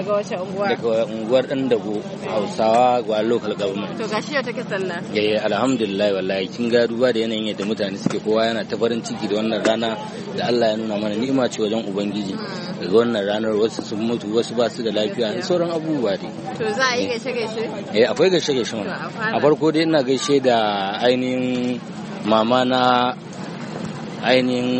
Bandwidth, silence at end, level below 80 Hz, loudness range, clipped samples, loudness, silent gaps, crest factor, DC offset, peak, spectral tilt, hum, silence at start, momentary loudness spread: 8.8 kHz; 0 s; -62 dBFS; 3 LU; under 0.1%; -21 LUFS; none; 18 dB; under 0.1%; -2 dBFS; -5 dB/octave; none; 0 s; 9 LU